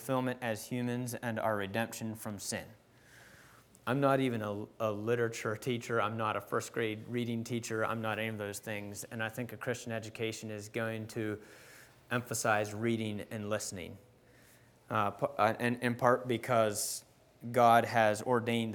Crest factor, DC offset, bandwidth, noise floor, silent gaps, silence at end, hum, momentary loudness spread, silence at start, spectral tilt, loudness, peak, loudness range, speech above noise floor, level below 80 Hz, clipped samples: 24 dB; under 0.1%; over 20 kHz; -62 dBFS; none; 0 s; none; 11 LU; 0 s; -5 dB/octave; -34 LUFS; -10 dBFS; 8 LU; 28 dB; -74 dBFS; under 0.1%